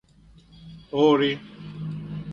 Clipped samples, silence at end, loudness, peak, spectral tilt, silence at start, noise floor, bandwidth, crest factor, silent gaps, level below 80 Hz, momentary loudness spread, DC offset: under 0.1%; 0 s; -24 LUFS; -6 dBFS; -7 dB/octave; 0.55 s; -53 dBFS; 7 kHz; 20 dB; none; -56 dBFS; 16 LU; under 0.1%